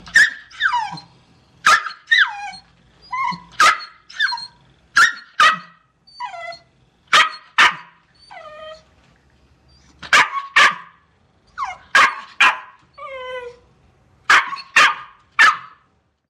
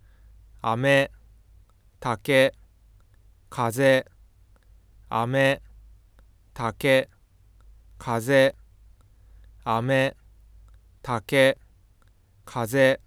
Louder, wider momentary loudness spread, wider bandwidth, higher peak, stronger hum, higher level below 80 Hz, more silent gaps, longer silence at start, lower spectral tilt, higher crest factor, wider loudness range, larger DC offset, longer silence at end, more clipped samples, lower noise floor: first, -15 LUFS vs -24 LUFS; first, 20 LU vs 15 LU; about the same, 16 kHz vs 16 kHz; first, 0 dBFS vs -6 dBFS; neither; second, -60 dBFS vs -54 dBFS; neither; second, 0.05 s vs 0.65 s; second, 0.5 dB/octave vs -5.5 dB/octave; about the same, 20 dB vs 20 dB; about the same, 3 LU vs 1 LU; neither; first, 0.65 s vs 0.1 s; neither; first, -62 dBFS vs -58 dBFS